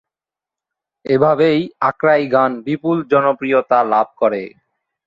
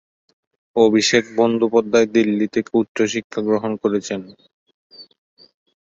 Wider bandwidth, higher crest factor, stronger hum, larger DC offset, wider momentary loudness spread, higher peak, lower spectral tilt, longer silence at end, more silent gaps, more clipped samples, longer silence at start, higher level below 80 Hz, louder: about the same, 7.6 kHz vs 8 kHz; about the same, 16 dB vs 18 dB; neither; neither; about the same, 6 LU vs 8 LU; about the same, -2 dBFS vs -2 dBFS; first, -8.5 dB/octave vs -4.5 dB/octave; second, 0.6 s vs 0.9 s; second, none vs 2.88-2.95 s, 3.24-3.30 s, 4.53-4.66 s, 4.74-4.90 s; neither; first, 1.05 s vs 0.75 s; about the same, -62 dBFS vs -62 dBFS; about the same, -16 LUFS vs -18 LUFS